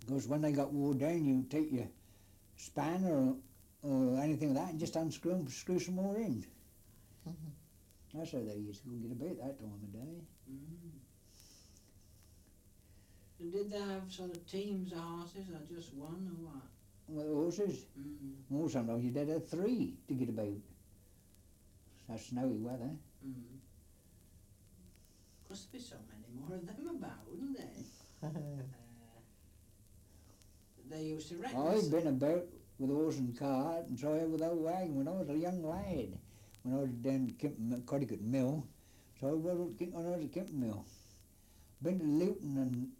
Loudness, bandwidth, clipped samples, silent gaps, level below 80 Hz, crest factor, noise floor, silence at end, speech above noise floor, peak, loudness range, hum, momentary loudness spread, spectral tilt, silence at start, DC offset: -39 LUFS; 16.5 kHz; under 0.1%; none; -66 dBFS; 16 dB; -64 dBFS; 0.05 s; 26 dB; -22 dBFS; 13 LU; none; 17 LU; -7 dB/octave; 0 s; under 0.1%